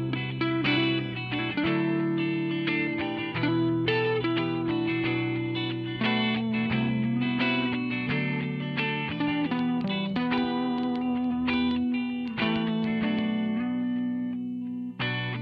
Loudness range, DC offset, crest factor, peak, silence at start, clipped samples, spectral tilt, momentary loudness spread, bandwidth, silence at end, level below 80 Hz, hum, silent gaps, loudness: 1 LU; under 0.1%; 14 dB; -14 dBFS; 0 s; under 0.1%; -8.5 dB/octave; 5 LU; 5.6 kHz; 0 s; -58 dBFS; none; none; -28 LUFS